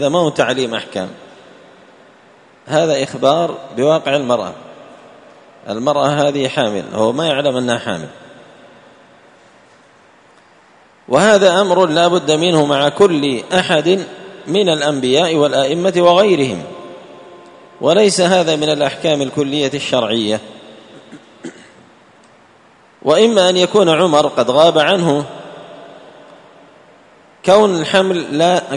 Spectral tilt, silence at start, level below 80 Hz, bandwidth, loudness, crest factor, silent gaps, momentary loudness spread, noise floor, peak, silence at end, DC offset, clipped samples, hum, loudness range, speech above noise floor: -4.5 dB/octave; 0 s; -58 dBFS; 11 kHz; -14 LUFS; 16 dB; none; 16 LU; -48 dBFS; 0 dBFS; 0 s; under 0.1%; under 0.1%; none; 8 LU; 34 dB